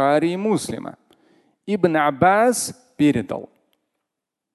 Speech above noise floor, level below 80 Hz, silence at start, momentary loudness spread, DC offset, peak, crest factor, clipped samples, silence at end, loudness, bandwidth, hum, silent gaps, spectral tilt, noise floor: 64 dB; -56 dBFS; 0 s; 16 LU; under 0.1%; -2 dBFS; 20 dB; under 0.1%; 1.1 s; -20 LUFS; 12.5 kHz; none; none; -5 dB/octave; -83 dBFS